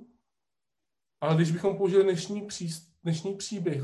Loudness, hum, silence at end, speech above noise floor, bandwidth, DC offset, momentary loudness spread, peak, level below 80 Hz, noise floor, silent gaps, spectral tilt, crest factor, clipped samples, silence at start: -28 LUFS; none; 0 s; 62 dB; 12.5 kHz; under 0.1%; 12 LU; -12 dBFS; -70 dBFS; -89 dBFS; none; -6 dB/octave; 18 dB; under 0.1%; 1.2 s